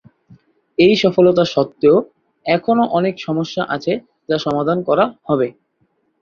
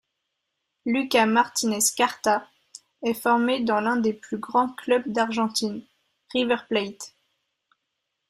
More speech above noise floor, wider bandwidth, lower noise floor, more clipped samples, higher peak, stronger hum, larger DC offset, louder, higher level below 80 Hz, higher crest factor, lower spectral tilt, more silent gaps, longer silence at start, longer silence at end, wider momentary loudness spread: second, 49 dB vs 56 dB; second, 7 kHz vs 15.5 kHz; second, -64 dBFS vs -80 dBFS; neither; first, -2 dBFS vs -6 dBFS; neither; neither; first, -17 LUFS vs -24 LUFS; first, -56 dBFS vs -70 dBFS; about the same, 16 dB vs 20 dB; first, -6.5 dB/octave vs -3 dB/octave; neither; about the same, 0.8 s vs 0.85 s; second, 0.7 s vs 1.2 s; about the same, 10 LU vs 11 LU